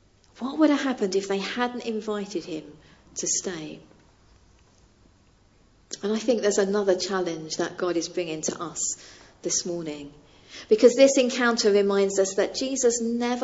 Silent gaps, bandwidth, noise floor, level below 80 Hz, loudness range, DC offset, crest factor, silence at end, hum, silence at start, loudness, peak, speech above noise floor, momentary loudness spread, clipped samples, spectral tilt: none; 8 kHz; -59 dBFS; -62 dBFS; 11 LU; under 0.1%; 22 dB; 0 s; none; 0.4 s; -24 LUFS; -4 dBFS; 35 dB; 17 LU; under 0.1%; -3 dB/octave